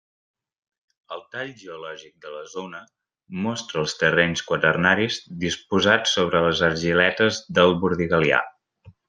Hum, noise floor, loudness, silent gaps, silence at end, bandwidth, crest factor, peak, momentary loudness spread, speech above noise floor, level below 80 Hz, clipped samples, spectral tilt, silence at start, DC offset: none; -53 dBFS; -21 LUFS; none; 0.2 s; 9.8 kHz; 22 dB; -2 dBFS; 19 LU; 31 dB; -58 dBFS; under 0.1%; -4.5 dB/octave; 1.1 s; under 0.1%